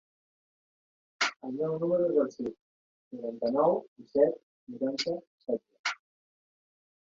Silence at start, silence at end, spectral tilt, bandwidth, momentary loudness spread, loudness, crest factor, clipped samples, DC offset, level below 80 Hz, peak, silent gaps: 1.2 s; 1.05 s; -4.5 dB/octave; 7.8 kHz; 13 LU; -31 LUFS; 22 dB; under 0.1%; under 0.1%; -74 dBFS; -10 dBFS; 2.61-3.11 s, 3.88-3.96 s, 4.43-4.67 s, 5.27-5.38 s, 5.79-5.84 s